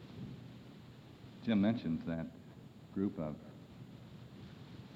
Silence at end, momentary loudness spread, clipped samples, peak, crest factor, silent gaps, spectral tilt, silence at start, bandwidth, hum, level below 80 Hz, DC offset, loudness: 0 s; 22 LU; under 0.1%; -22 dBFS; 18 dB; none; -8.5 dB/octave; 0 s; 7.8 kHz; none; -66 dBFS; under 0.1%; -38 LUFS